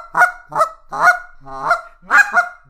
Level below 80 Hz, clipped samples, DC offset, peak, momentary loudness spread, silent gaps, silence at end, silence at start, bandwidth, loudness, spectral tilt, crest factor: -48 dBFS; under 0.1%; under 0.1%; 0 dBFS; 10 LU; none; 0.15 s; 0 s; 15.5 kHz; -16 LUFS; -2 dB/octave; 16 dB